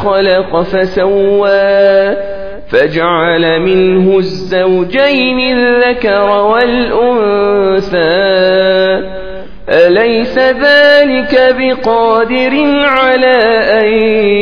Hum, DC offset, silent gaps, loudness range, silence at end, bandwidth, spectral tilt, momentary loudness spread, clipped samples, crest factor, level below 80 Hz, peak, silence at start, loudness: none; 3%; none; 2 LU; 0 s; 5.4 kHz; -7 dB/octave; 5 LU; 0.4%; 10 dB; -38 dBFS; 0 dBFS; 0 s; -9 LUFS